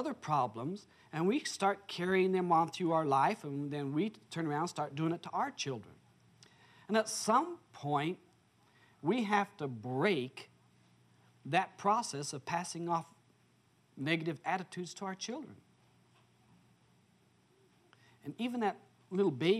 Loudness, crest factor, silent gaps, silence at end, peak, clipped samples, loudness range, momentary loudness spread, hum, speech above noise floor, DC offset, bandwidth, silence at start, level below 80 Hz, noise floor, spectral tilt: -35 LUFS; 20 dB; none; 0 s; -16 dBFS; under 0.1%; 11 LU; 13 LU; none; 35 dB; under 0.1%; 14 kHz; 0 s; -84 dBFS; -70 dBFS; -5 dB/octave